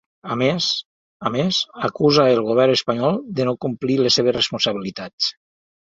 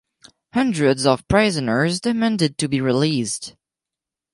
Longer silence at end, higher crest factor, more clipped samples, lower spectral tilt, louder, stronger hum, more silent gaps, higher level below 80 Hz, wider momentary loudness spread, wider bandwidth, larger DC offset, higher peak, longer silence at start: second, 0.6 s vs 0.85 s; about the same, 18 dB vs 18 dB; neither; about the same, -5 dB/octave vs -5 dB/octave; about the same, -19 LUFS vs -20 LUFS; neither; first, 0.85-1.20 s, 5.13-5.18 s vs none; second, -58 dBFS vs -46 dBFS; about the same, 9 LU vs 8 LU; second, 7.8 kHz vs 11.5 kHz; neither; about the same, -2 dBFS vs -2 dBFS; second, 0.25 s vs 0.55 s